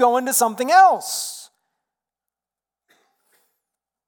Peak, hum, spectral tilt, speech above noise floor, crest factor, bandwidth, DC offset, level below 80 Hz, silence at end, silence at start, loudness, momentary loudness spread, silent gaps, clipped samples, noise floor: -4 dBFS; none; -1 dB/octave; over 73 dB; 18 dB; 19 kHz; under 0.1%; -76 dBFS; 2.65 s; 0 s; -17 LUFS; 16 LU; none; under 0.1%; under -90 dBFS